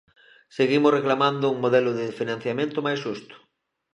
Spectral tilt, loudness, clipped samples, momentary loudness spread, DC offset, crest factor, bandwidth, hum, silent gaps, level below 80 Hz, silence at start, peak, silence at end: -6.5 dB/octave; -23 LUFS; under 0.1%; 10 LU; under 0.1%; 18 dB; 10 kHz; none; none; -74 dBFS; 0.55 s; -6 dBFS; 0.55 s